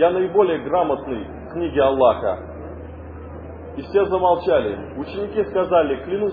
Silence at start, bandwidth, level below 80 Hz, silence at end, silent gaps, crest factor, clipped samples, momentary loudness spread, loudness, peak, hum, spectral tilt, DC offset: 0 s; 5 kHz; -42 dBFS; 0 s; none; 18 dB; under 0.1%; 18 LU; -20 LUFS; -2 dBFS; none; -10 dB/octave; under 0.1%